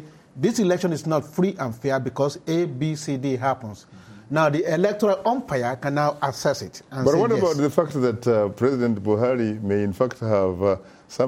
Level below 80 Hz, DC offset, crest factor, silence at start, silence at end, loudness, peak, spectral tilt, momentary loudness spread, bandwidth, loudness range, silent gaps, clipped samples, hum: -60 dBFS; under 0.1%; 18 dB; 0 s; 0 s; -23 LUFS; -4 dBFS; -6.5 dB/octave; 6 LU; 16.5 kHz; 3 LU; none; under 0.1%; none